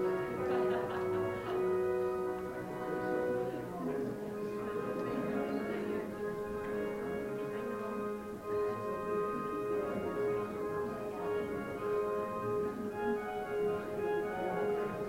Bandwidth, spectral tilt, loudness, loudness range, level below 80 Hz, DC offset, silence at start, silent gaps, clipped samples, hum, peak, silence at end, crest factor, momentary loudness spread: 16 kHz; -7 dB/octave; -37 LUFS; 3 LU; -62 dBFS; under 0.1%; 0 s; none; under 0.1%; none; -22 dBFS; 0 s; 14 dB; 5 LU